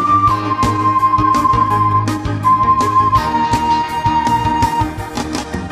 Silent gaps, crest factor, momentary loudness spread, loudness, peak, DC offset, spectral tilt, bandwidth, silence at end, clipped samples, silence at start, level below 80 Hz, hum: none; 12 dB; 8 LU; -14 LUFS; -2 dBFS; under 0.1%; -5.5 dB/octave; 15.5 kHz; 0 s; under 0.1%; 0 s; -32 dBFS; none